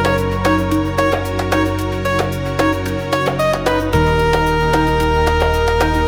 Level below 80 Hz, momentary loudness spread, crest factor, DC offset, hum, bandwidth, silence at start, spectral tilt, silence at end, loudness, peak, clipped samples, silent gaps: -26 dBFS; 4 LU; 14 dB; under 0.1%; none; 20 kHz; 0 s; -6 dB/octave; 0 s; -16 LUFS; -2 dBFS; under 0.1%; none